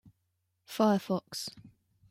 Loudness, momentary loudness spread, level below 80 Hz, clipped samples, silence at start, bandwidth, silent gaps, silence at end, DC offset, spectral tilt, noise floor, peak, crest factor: -31 LUFS; 15 LU; -76 dBFS; under 0.1%; 0.7 s; 16 kHz; none; 0.45 s; under 0.1%; -5.5 dB/octave; -79 dBFS; -14 dBFS; 20 dB